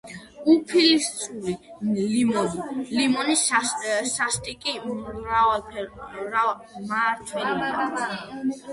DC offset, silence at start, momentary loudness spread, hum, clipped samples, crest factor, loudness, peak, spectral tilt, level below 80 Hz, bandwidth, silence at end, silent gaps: under 0.1%; 0.05 s; 12 LU; none; under 0.1%; 18 dB; -24 LUFS; -6 dBFS; -3 dB/octave; -56 dBFS; 11.5 kHz; 0 s; none